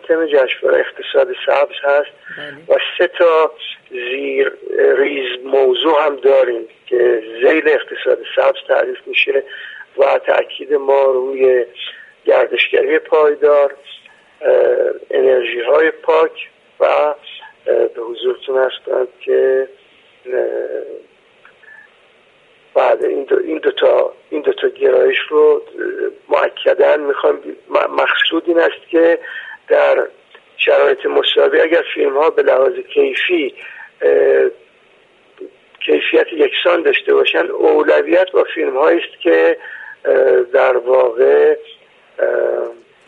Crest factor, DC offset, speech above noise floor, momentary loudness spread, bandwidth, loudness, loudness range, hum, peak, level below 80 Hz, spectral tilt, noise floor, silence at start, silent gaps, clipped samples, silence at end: 14 dB; under 0.1%; 36 dB; 11 LU; 4.7 kHz; -14 LUFS; 4 LU; none; 0 dBFS; -66 dBFS; -4.5 dB/octave; -50 dBFS; 0.05 s; none; under 0.1%; 0.35 s